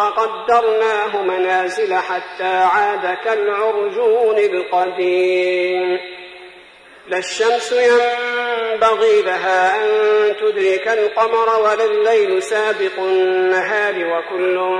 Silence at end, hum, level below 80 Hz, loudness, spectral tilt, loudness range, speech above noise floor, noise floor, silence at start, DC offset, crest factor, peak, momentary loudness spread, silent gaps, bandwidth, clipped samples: 0 s; none; -62 dBFS; -16 LUFS; -3 dB/octave; 3 LU; 27 dB; -43 dBFS; 0 s; under 0.1%; 14 dB; -2 dBFS; 6 LU; none; 10.5 kHz; under 0.1%